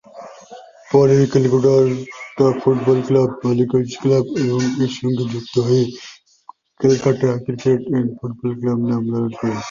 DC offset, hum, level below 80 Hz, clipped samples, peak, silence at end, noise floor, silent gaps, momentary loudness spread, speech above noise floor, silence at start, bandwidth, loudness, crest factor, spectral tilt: under 0.1%; none; -54 dBFS; under 0.1%; -2 dBFS; 0 s; -45 dBFS; none; 11 LU; 29 dB; 0.15 s; 7.4 kHz; -18 LUFS; 16 dB; -7.5 dB/octave